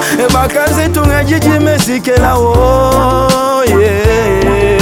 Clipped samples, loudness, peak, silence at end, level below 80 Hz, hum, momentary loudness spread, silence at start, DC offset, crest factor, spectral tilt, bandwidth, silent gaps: 0.2%; -10 LUFS; 0 dBFS; 0 s; -20 dBFS; none; 2 LU; 0 s; under 0.1%; 10 dB; -5.5 dB/octave; 20 kHz; none